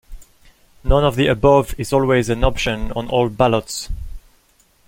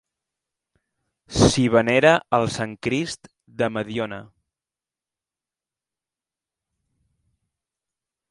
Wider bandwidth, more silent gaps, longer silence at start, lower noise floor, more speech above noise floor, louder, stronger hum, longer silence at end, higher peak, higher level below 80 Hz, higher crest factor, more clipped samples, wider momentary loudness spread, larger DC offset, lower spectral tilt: first, 16.5 kHz vs 11.5 kHz; neither; second, 0.1 s vs 1.3 s; second, -57 dBFS vs under -90 dBFS; second, 40 dB vs over 70 dB; first, -18 LUFS vs -21 LUFS; neither; second, 0.7 s vs 4.05 s; about the same, -2 dBFS vs 0 dBFS; first, -28 dBFS vs -46 dBFS; second, 18 dB vs 24 dB; neither; about the same, 14 LU vs 15 LU; neither; about the same, -5.5 dB/octave vs -5 dB/octave